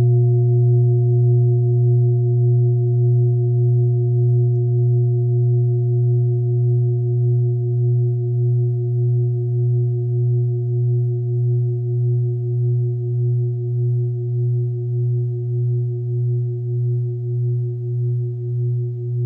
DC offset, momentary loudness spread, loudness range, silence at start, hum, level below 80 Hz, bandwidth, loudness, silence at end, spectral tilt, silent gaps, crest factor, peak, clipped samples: under 0.1%; 6 LU; 5 LU; 0 s; none; -68 dBFS; 0.8 kHz; -19 LUFS; 0 s; -15 dB/octave; none; 8 dB; -8 dBFS; under 0.1%